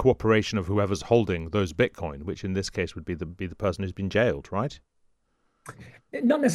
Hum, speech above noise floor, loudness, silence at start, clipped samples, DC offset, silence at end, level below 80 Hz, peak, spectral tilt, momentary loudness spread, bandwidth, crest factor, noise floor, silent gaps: none; 45 dB; -27 LUFS; 0 s; under 0.1%; under 0.1%; 0 s; -48 dBFS; -8 dBFS; -6 dB/octave; 12 LU; 12.5 kHz; 20 dB; -71 dBFS; none